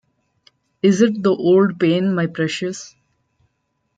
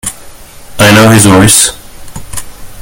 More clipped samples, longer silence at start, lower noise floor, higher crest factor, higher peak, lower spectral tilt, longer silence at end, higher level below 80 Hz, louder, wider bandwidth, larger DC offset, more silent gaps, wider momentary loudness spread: second, under 0.1% vs 4%; first, 0.85 s vs 0.05 s; first, -71 dBFS vs -29 dBFS; first, 16 dB vs 8 dB; about the same, -2 dBFS vs 0 dBFS; first, -6 dB/octave vs -3.5 dB/octave; first, 1.1 s vs 0 s; second, -64 dBFS vs -30 dBFS; second, -17 LUFS vs -4 LUFS; second, 9.2 kHz vs over 20 kHz; neither; neither; second, 10 LU vs 20 LU